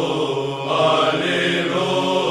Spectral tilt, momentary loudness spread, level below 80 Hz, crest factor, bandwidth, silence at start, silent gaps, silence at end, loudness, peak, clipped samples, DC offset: -4.5 dB/octave; 6 LU; -60 dBFS; 14 dB; 13.5 kHz; 0 s; none; 0 s; -19 LUFS; -4 dBFS; under 0.1%; under 0.1%